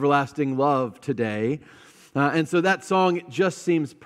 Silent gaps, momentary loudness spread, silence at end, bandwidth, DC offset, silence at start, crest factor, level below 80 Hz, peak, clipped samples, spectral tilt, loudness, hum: none; 6 LU; 0.1 s; 13.5 kHz; under 0.1%; 0 s; 16 dB; -72 dBFS; -6 dBFS; under 0.1%; -6 dB/octave; -24 LUFS; none